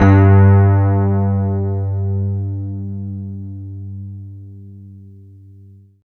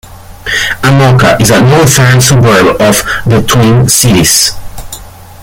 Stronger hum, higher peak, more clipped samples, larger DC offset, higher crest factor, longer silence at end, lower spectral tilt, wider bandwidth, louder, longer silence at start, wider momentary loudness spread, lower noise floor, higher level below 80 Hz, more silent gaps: neither; about the same, 0 dBFS vs 0 dBFS; second, under 0.1% vs 0.5%; neither; first, 14 dB vs 6 dB; first, 0.95 s vs 0 s; first, -11 dB/octave vs -4 dB/octave; second, 2.9 kHz vs over 20 kHz; second, -15 LUFS vs -6 LUFS; about the same, 0 s vs 0.1 s; first, 23 LU vs 18 LU; first, -43 dBFS vs -27 dBFS; second, -46 dBFS vs -28 dBFS; neither